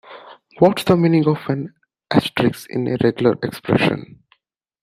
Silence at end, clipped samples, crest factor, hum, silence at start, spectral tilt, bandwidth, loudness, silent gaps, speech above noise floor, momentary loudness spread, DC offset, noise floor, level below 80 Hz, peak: 0.8 s; under 0.1%; 16 dB; none; 0.1 s; -7 dB/octave; 15.5 kHz; -18 LUFS; none; 44 dB; 10 LU; under 0.1%; -62 dBFS; -54 dBFS; -2 dBFS